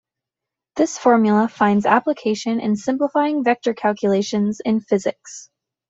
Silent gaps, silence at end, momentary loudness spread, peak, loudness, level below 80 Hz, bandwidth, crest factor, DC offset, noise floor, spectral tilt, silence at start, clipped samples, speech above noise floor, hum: none; 0.45 s; 7 LU; -2 dBFS; -19 LUFS; -64 dBFS; 8 kHz; 18 dB; under 0.1%; -86 dBFS; -5.5 dB/octave; 0.75 s; under 0.1%; 67 dB; none